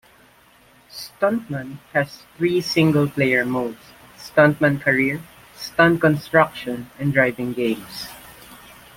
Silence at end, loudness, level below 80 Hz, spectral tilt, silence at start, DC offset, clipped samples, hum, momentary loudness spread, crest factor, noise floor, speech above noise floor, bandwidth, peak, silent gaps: 0.45 s; -20 LUFS; -56 dBFS; -6 dB/octave; 0.95 s; under 0.1%; under 0.1%; none; 18 LU; 20 dB; -53 dBFS; 33 dB; 17 kHz; -2 dBFS; none